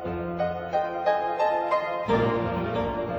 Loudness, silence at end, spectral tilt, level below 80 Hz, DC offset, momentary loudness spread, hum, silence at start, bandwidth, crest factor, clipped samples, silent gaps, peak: -26 LUFS; 0 s; -7.5 dB/octave; -48 dBFS; under 0.1%; 5 LU; none; 0 s; over 20 kHz; 18 dB; under 0.1%; none; -8 dBFS